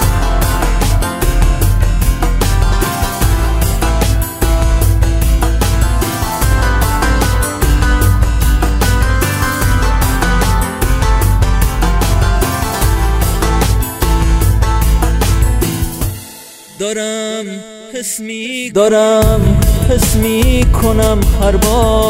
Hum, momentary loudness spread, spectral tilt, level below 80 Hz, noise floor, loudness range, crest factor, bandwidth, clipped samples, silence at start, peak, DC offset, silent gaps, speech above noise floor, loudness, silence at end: none; 7 LU; -5 dB/octave; -14 dBFS; -34 dBFS; 4 LU; 12 dB; 16.5 kHz; under 0.1%; 0 s; 0 dBFS; under 0.1%; none; 24 dB; -13 LUFS; 0 s